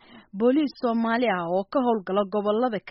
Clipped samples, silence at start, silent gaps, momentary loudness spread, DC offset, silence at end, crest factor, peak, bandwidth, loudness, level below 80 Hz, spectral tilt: under 0.1%; 0.15 s; none; 3 LU; under 0.1%; 0 s; 12 dB; -12 dBFS; 5.8 kHz; -24 LUFS; -66 dBFS; -4.5 dB/octave